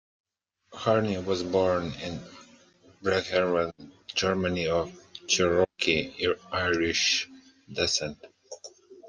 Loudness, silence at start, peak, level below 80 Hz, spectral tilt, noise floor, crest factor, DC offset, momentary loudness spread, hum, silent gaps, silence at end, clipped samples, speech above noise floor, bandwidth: -27 LUFS; 0.7 s; -8 dBFS; -60 dBFS; -3.5 dB/octave; -61 dBFS; 20 dB; under 0.1%; 18 LU; none; none; 0 s; under 0.1%; 34 dB; 10.5 kHz